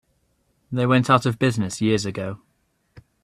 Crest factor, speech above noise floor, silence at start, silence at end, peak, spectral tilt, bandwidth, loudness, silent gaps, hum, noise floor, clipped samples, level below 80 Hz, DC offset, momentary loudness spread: 22 dB; 46 dB; 0.7 s; 0.25 s; -2 dBFS; -6 dB/octave; 13 kHz; -21 LUFS; none; none; -67 dBFS; under 0.1%; -58 dBFS; under 0.1%; 14 LU